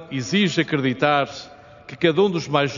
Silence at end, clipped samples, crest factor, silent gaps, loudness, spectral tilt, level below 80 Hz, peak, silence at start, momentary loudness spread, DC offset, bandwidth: 0 s; under 0.1%; 18 dB; none; -20 LUFS; -4 dB/octave; -60 dBFS; -2 dBFS; 0 s; 10 LU; under 0.1%; 7.4 kHz